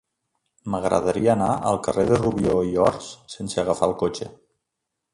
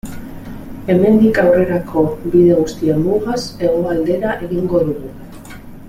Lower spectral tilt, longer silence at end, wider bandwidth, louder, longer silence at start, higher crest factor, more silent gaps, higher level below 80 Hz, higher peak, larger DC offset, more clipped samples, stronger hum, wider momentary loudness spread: second, -6 dB/octave vs -7.5 dB/octave; first, 0.8 s vs 0 s; second, 11.5 kHz vs 15.5 kHz; second, -22 LUFS vs -15 LUFS; first, 0.65 s vs 0.05 s; first, 20 dB vs 14 dB; neither; second, -48 dBFS vs -38 dBFS; about the same, -4 dBFS vs -2 dBFS; neither; neither; neither; second, 15 LU vs 21 LU